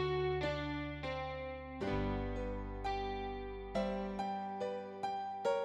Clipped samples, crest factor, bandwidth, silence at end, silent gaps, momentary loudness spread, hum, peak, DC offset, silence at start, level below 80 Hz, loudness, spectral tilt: under 0.1%; 16 dB; 11 kHz; 0 s; none; 6 LU; none; -24 dBFS; under 0.1%; 0 s; -50 dBFS; -40 LUFS; -7 dB/octave